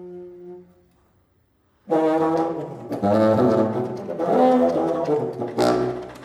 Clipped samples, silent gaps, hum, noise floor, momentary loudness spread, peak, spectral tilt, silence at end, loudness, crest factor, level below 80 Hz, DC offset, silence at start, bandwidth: under 0.1%; none; none; -63 dBFS; 16 LU; -4 dBFS; -7.5 dB/octave; 0 s; -21 LUFS; 18 dB; -58 dBFS; under 0.1%; 0 s; 14.5 kHz